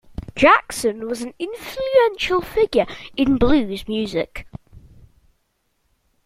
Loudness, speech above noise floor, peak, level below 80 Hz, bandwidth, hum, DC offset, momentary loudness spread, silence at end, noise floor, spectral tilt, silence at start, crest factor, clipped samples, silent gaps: -20 LUFS; 50 dB; -2 dBFS; -40 dBFS; 16 kHz; none; under 0.1%; 15 LU; 1.45 s; -68 dBFS; -4.5 dB/octave; 0.2 s; 20 dB; under 0.1%; none